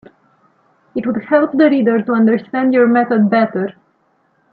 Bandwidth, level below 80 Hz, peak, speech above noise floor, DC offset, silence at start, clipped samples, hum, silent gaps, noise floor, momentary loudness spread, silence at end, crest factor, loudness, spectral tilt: 4.8 kHz; -64 dBFS; 0 dBFS; 46 dB; under 0.1%; 0.95 s; under 0.1%; none; none; -59 dBFS; 11 LU; 0.8 s; 14 dB; -14 LUFS; -10 dB/octave